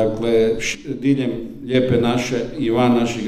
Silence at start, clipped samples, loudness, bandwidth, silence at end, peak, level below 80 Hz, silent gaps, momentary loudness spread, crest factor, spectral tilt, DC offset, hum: 0 s; under 0.1%; -19 LUFS; 14 kHz; 0 s; -4 dBFS; -42 dBFS; none; 7 LU; 14 dB; -6 dB/octave; under 0.1%; none